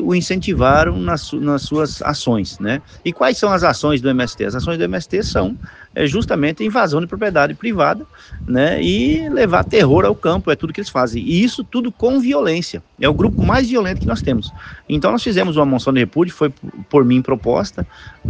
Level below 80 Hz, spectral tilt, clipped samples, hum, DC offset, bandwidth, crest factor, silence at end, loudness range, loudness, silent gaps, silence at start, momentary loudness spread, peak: -34 dBFS; -6 dB/octave; under 0.1%; none; under 0.1%; 9.6 kHz; 16 dB; 0 s; 2 LU; -17 LUFS; none; 0 s; 9 LU; 0 dBFS